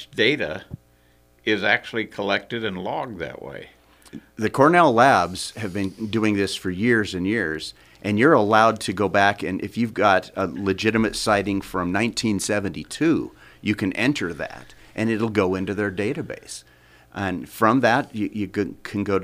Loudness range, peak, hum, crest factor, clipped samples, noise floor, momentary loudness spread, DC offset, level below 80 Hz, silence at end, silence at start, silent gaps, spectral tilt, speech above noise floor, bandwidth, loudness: 6 LU; -2 dBFS; none; 20 dB; under 0.1%; -58 dBFS; 16 LU; under 0.1%; -54 dBFS; 0 s; 0 s; none; -5 dB/octave; 36 dB; 15.5 kHz; -22 LUFS